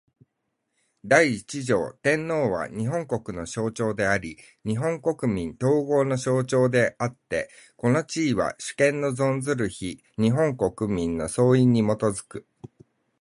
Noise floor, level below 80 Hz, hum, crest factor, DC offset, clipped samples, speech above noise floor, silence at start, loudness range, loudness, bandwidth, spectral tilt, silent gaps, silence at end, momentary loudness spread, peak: -78 dBFS; -54 dBFS; none; 20 dB; under 0.1%; under 0.1%; 54 dB; 1.05 s; 3 LU; -24 LUFS; 11.5 kHz; -6 dB/octave; none; 0.55 s; 10 LU; -4 dBFS